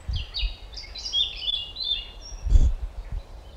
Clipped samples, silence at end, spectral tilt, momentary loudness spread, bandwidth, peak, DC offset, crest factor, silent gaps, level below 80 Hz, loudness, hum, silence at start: under 0.1%; 0 s; -3.5 dB/octave; 15 LU; 8 kHz; -4 dBFS; under 0.1%; 20 dB; none; -26 dBFS; -27 LUFS; none; 0 s